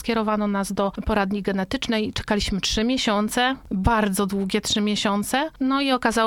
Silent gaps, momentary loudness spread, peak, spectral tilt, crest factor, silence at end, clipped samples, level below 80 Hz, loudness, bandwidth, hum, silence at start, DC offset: none; 4 LU; -6 dBFS; -4 dB/octave; 16 dB; 0 s; under 0.1%; -38 dBFS; -23 LUFS; 17 kHz; none; 0 s; under 0.1%